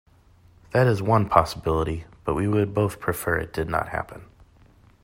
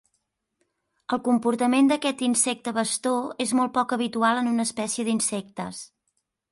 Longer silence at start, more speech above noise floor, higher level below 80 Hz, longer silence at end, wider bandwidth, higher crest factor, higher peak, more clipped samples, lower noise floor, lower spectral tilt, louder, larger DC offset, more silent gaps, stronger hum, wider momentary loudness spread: second, 0.75 s vs 1.1 s; second, 32 dB vs 52 dB; first, -44 dBFS vs -70 dBFS; first, 0.8 s vs 0.65 s; first, 16 kHz vs 11.5 kHz; first, 24 dB vs 16 dB; first, -2 dBFS vs -8 dBFS; neither; second, -55 dBFS vs -76 dBFS; first, -7 dB/octave vs -3 dB/octave; about the same, -24 LUFS vs -24 LUFS; neither; neither; neither; about the same, 11 LU vs 11 LU